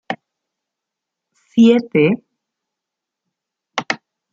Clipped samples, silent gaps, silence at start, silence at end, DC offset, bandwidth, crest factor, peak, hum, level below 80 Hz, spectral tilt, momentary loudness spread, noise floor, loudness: under 0.1%; none; 0.1 s; 0.35 s; under 0.1%; 7.4 kHz; 18 dB; -2 dBFS; none; -64 dBFS; -6.5 dB/octave; 16 LU; -83 dBFS; -17 LUFS